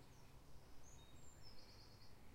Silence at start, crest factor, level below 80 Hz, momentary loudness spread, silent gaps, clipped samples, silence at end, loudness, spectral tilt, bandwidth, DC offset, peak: 0 s; 12 dB; -68 dBFS; 3 LU; none; under 0.1%; 0 s; -64 LUFS; -4 dB/octave; 16 kHz; under 0.1%; -46 dBFS